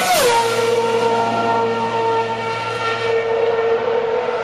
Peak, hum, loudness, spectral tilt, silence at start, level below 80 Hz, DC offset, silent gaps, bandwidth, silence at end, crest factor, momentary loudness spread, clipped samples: -4 dBFS; none; -18 LUFS; -3 dB/octave; 0 s; -54 dBFS; under 0.1%; none; 15.5 kHz; 0 s; 12 dB; 5 LU; under 0.1%